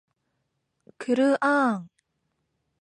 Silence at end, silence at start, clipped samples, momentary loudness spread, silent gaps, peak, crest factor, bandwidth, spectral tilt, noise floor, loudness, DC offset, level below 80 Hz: 1 s; 1 s; under 0.1%; 13 LU; none; -10 dBFS; 16 dB; 10 kHz; -5.5 dB/octave; -77 dBFS; -24 LUFS; under 0.1%; -80 dBFS